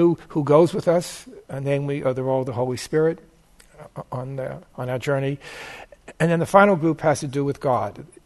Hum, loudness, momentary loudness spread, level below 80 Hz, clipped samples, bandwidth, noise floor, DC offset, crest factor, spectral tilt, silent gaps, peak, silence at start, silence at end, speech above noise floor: none; -22 LUFS; 19 LU; -56 dBFS; under 0.1%; 12.5 kHz; -52 dBFS; under 0.1%; 22 dB; -6.5 dB/octave; none; 0 dBFS; 0 s; 0.2 s; 30 dB